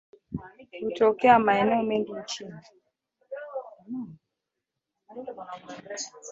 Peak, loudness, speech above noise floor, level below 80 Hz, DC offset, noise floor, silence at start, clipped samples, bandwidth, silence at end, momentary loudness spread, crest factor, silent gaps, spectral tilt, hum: -6 dBFS; -25 LUFS; 59 dB; -62 dBFS; under 0.1%; -85 dBFS; 0.3 s; under 0.1%; 8 kHz; 0 s; 22 LU; 22 dB; none; -4.5 dB/octave; none